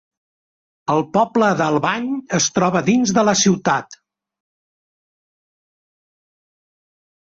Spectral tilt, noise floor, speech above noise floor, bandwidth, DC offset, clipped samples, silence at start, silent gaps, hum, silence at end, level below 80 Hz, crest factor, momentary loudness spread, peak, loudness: -4 dB/octave; under -90 dBFS; over 73 dB; 8 kHz; under 0.1%; under 0.1%; 0.9 s; none; none; 3.3 s; -58 dBFS; 18 dB; 6 LU; -4 dBFS; -17 LUFS